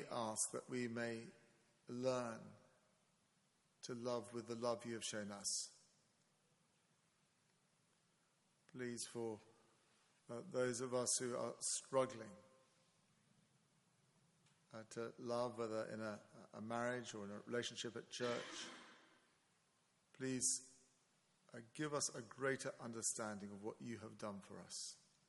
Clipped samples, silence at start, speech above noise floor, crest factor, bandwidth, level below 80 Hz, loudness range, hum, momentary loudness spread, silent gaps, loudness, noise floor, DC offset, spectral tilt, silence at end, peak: under 0.1%; 0 s; 34 dB; 24 dB; 11.5 kHz; under -90 dBFS; 10 LU; none; 16 LU; none; -45 LUFS; -80 dBFS; under 0.1%; -3 dB/octave; 0.3 s; -24 dBFS